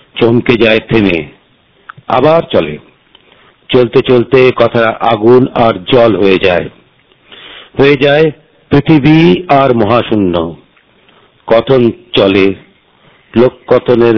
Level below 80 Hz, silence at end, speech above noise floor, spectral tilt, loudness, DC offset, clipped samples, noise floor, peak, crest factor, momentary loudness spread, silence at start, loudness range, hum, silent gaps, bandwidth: -38 dBFS; 0 s; 41 dB; -8.5 dB/octave; -9 LUFS; under 0.1%; 4%; -49 dBFS; 0 dBFS; 10 dB; 9 LU; 0.15 s; 4 LU; none; none; 5.4 kHz